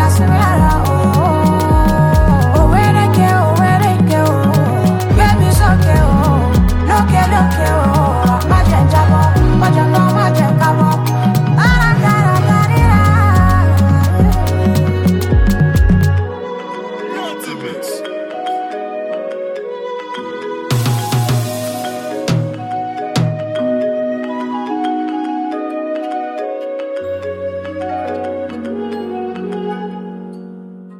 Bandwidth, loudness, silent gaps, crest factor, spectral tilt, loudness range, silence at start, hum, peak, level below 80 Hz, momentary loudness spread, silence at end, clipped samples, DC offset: 17 kHz; -14 LUFS; none; 12 dB; -7 dB/octave; 11 LU; 0 s; none; 0 dBFS; -22 dBFS; 13 LU; 0 s; under 0.1%; under 0.1%